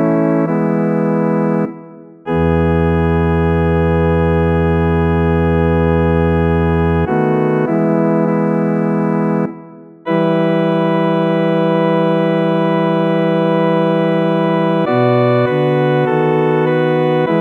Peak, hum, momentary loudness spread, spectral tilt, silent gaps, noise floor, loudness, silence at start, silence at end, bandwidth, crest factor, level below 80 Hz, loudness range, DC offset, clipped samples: -2 dBFS; none; 2 LU; -9.5 dB/octave; none; -36 dBFS; -14 LUFS; 0 s; 0 s; 4.3 kHz; 12 dB; -30 dBFS; 2 LU; under 0.1%; under 0.1%